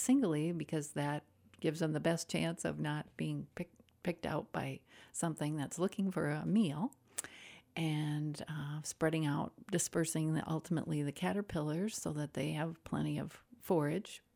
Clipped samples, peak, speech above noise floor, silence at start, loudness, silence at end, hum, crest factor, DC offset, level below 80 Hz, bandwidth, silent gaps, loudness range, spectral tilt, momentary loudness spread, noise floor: under 0.1%; -16 dBFS; 20 dB; 0 s; -38 LUFS; 0.15 s; none; 20 dB; under 0.1%; -68 dBFS; 19.5 kHz; none; 3 LU; -5.5 dB/octave; 10 LU; -57 dBFS